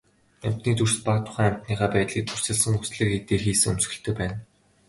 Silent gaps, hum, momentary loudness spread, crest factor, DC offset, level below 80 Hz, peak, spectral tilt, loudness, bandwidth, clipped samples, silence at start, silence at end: none; none; 8 LU; 18 dB; under 0.1%; -46 dBFS; -6 dBFS; -4.5 dB/octave; -24 LUFS; 12 kHz; under 0.1%; 0.4 s; 0.45 s